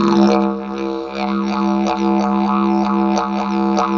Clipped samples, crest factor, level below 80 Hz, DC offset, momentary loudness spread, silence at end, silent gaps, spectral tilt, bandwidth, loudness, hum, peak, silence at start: under 0.1%; 16 dB; -48 dBFS; under 0.1%; 8 LU; 0 s; none; -7 dB/octave; 7.2 kHz; -17 LUFS; none; -2 dBFS; 0 s